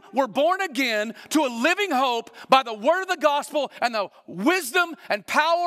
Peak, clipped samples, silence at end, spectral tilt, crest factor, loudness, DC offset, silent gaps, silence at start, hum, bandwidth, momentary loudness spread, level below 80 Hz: -4 dBFS; under 0.1%; 0 s; -2.5 dB/octave; 18 dB; -23 LUFS; under 0.1%; none; 0.15 s; none; 16 kHz; 7 LU; -78 dBFS